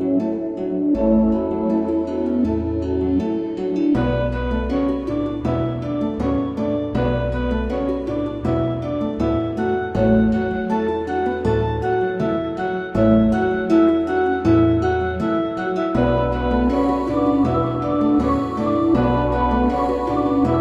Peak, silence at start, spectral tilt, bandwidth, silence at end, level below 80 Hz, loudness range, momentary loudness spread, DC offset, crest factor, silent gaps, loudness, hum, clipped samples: -4 dBFS; 0 s; -9 dB/octave; 7.8 kHz; 0 s; -32 dBFS; 4 LU; 6 LU; under 0.1%; 14 dB; none; -20 LUFS; none; under 0.1%